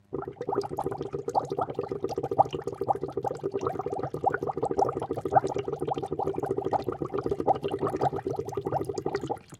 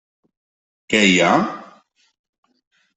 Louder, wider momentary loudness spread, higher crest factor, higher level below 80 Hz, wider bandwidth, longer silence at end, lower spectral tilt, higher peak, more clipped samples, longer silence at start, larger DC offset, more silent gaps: second, -30 LUFS vs -16 LUFS; second, 7 LU vs 14 LU; about the same, 22 dB vs 20 dB; about the same, -56 dBFS vs -60 dBFS; first, 14 kHz vs 8.4 kHz; second, 0.05 s vs 1.35 s; first, -7 dB/octave vs -4 dB/octave; second, -8 dBFS vs -2 dBFS; neither; second, 0.1 s vs 0.9 s; neither; neither